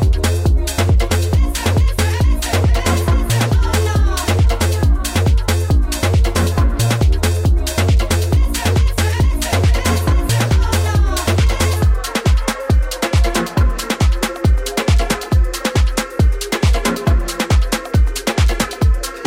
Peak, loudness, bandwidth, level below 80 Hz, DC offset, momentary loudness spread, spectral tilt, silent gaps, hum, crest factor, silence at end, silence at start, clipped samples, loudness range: -2 dBFS; -16 LUFS; 16.5 kHz; -18 dBFS; under 0.1%; 2 LU; -5 dB/octave; none; none; 12 dB; 0 s; 0 s; under 0.1%; 1 LU